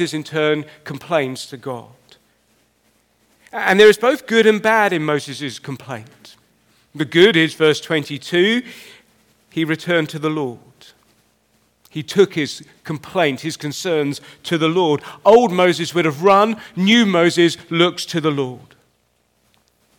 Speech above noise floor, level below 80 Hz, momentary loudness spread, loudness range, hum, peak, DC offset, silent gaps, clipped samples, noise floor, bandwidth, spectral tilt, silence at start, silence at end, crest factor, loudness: 46 dB; -64 dBFS; 17 LU; 9 LU; none; -2 dBFS; under 0.1%; none; under 0.1%; -63 dBFS; 18 kHz; -5 dB/octave; 0 s; 1.4 s; 18 dB; -17 LUFS